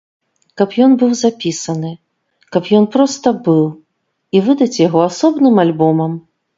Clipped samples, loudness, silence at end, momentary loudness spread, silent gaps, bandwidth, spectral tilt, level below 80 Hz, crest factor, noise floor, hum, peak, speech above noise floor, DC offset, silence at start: under 0.1%; -14 LUFS; 0.4 s; 10 LU; none; 7.8 kHz; -6 dB/octave; -60 dBFS; 14 dB; -67 dBFS; none; 0 dBFS; 55 dB; under 0.1%; 0.55 s